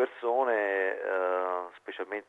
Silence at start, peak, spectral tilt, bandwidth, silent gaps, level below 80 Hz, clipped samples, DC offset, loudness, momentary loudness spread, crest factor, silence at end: 0 s; -16 dBFS; -4.5 dB/octave; 4.1 kHz; none; -86 dBFS; under 0.1%; under 0.1%; -30 LUFS; 10 LU; 14 dB; 0.05 s